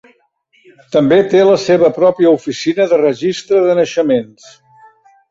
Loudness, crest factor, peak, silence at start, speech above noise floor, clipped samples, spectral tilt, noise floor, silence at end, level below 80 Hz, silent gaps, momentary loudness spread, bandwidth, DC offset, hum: -12 LUFS; 12 dB; 0 dBFS; 0.9 s; 44 dB; under 0.1%; -6 dB/octave; -56 dBFS; 1.05 s; -56 dBFS; none; 7 LU; 7.8 kHz; under 0.1%; none